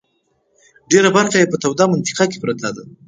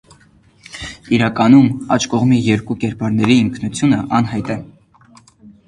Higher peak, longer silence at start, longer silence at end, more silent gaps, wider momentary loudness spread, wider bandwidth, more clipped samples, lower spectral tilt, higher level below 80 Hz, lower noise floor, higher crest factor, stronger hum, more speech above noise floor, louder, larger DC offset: about the same, 0 dBFS vs 0 dBFS; first, 0.9 s vs 0.75 s; about the same, 0.2 s vs 0.2 s; neither; second, 10 LU vs 16 LU; second, 9.6 kHz vs 11 kHz; neither; second, -4 dB/octave vs -6 dB/octave; second, -60 dBFS vs -46 dBFS; first, -65 dBFS vs -50 dBFS; about the same, 18 dB vs 16 dB; neither; first, 49 dB vs 36 dB; about the same, -16 LUFS vs -15 LUFS; neither